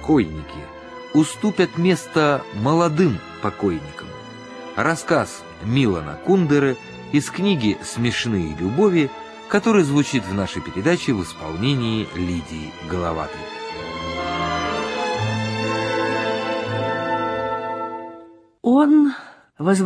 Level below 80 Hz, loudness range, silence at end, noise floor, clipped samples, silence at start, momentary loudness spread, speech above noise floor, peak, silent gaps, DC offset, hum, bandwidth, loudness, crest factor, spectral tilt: -48 dBFS; 5 LU; 0 s; -45 dBFS; under 0.1%; 0 s; 14 LU; 25 dB; -2 dBFS; none; under 0.1%; none; 11 kHz; -21 LUFS; 18 dB; -6 dB/octave